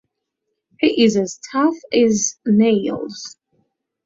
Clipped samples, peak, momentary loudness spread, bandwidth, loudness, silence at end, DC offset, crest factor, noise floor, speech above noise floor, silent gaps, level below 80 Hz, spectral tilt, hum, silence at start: under 0.1%; -2 dBFS; 13 LU; 7.8 kHz; -18 LUFS; 0.75 s; under 0.1%; 18 dB; -77 dBFS; 60 dB; none; -60 dBFS; -4.5 dB/octave; none; 0.8 s